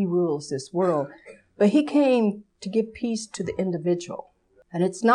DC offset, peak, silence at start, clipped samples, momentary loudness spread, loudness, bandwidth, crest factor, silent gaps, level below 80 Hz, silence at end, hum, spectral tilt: under 0.1%; -8 dBFS; 0 s; under 0.1%; 14 LU; -24 LUFS; 11 kHz; 16 dB; none; -62 dBFS; 0 s; none; -6 dB/octave